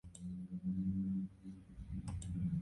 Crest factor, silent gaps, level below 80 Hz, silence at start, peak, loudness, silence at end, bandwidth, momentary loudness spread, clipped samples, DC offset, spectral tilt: 12 dB; none; -54 dBFS; 0.05 s; -30 dBFS; -43 LUFS; 0 s; 11 kHz; 14 LU; under 0.1%; under 0.1%; -8 dB/octave